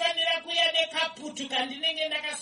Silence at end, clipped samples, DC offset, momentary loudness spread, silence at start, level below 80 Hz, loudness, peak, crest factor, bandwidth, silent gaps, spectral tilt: 0 s; under 0.1%; under 0.1%; 7 LU; 0 s; -74 dBFS; -26 LUFS; -10 dBFS; 18 dB; 11.5 kHz; none; 0 dB/octave